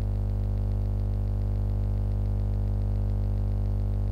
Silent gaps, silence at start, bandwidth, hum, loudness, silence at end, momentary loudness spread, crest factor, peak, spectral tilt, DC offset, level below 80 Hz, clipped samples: none; 0 s; 4.7 kHz; 50 Hz at -25 dBFS; -29 LUFS; 0 s; 1 LU; 6 dB; -20 dBFS; -10 dB/octave; 0.1%; -28 dBFS; under 0.1%